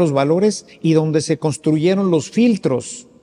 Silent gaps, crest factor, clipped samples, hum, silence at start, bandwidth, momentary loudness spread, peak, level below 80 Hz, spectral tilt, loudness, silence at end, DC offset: none; 14 dB; under 0.1%; none; 0 s; 11.5 kHz; 6 LU; -4 dBFS; -60 dBFS; -6.5 dB/octave; -17 LUFS; 0.2 s; under 0.1%